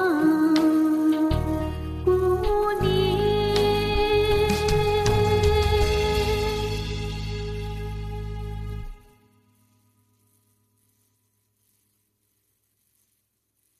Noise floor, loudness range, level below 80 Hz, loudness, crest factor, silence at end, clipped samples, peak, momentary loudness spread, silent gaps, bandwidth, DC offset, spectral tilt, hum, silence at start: -73 dBFS; 16 LU; -34 dBFS; -23 LUFS; 16 dB; 4.85 s; under 0.1%; -8 dBFS; 13 LU; none; 14 kHz; under 0.1%; -6 dB/octave; none; 0 s